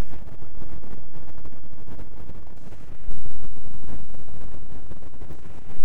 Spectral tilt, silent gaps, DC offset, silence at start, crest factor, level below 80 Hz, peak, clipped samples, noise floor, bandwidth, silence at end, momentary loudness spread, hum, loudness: -8 dB/octave; none; under 0.1%; 0 s; 6 dB; -42 dBFS; -6 dBFS; under 0.1%; -42 dBFS; 7.8 kHz; 0 s; 4 LU; none; -44 LUFS